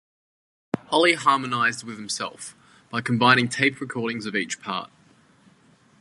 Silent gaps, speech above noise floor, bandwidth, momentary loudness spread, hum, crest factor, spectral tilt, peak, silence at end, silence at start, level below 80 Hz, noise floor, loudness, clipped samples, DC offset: none; 34 dB; 11.5 kHz; 15 LU; none; 24 dB; -4 dB/octave; 0 dBFS; 1.15 s; 0.75 s; -68 dBFS; -58 dBFS; -23 LUFS; under 0.1%; under 0.1%